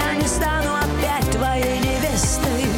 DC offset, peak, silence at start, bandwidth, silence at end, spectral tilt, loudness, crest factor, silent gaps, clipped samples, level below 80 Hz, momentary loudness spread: under 0.1%; -10 dBFS; 0 s; 18.5 kHz; 0 s; -4 dB/octave; -20 LUFS; 10 dB; none; under 0.1%; -28 dBFS; 1 LU